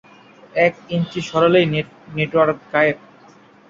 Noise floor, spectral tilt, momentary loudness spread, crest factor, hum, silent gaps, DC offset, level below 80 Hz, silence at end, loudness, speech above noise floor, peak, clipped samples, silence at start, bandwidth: -48 dBFS; -6.5 dB/octave; 10 LU; 18 dB; none; none; under 0.1%; -56 dBFS; 0.75 s; -18 LUFS; 30 dB; -2 dBFS; under 0.1%; 0.55 s; 7.6 kHz